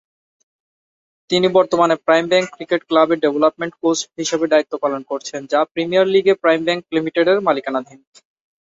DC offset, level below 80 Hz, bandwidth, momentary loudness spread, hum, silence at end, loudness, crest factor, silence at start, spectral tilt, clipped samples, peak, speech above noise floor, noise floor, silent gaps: under 0.1%; -64 dBFS; 8 kHz; 7 LU; none; 0.8 s; -17 LUFS; 16 dB; 1.3 s; -4 dB/octave; under 0.1%; -2 dBFS; over 73 dB; under -90 dBFS; 5.71-5.75 s